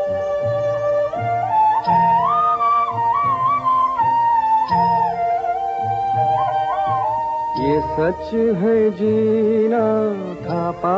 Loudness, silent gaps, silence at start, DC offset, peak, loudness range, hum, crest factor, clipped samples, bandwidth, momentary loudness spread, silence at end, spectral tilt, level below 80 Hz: -18 LUFS; none; 0 s; under 0.1%; -6 dBFS; 3 LU; none; 12 dB; under 0.1%; 7.6 kHz; 5 LU; 0 s; -6 dB/octave; -50 dBFS